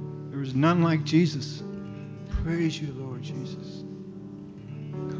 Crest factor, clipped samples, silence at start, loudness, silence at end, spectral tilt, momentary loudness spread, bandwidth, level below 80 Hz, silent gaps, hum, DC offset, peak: 18 dB; under 0.1%; 0 s; -28 LUFS; 0 s; -7 dB/octave; 18 LU; 7.8 kHz; -44 dBFS; none; none; under 0.1%; -10 dBFS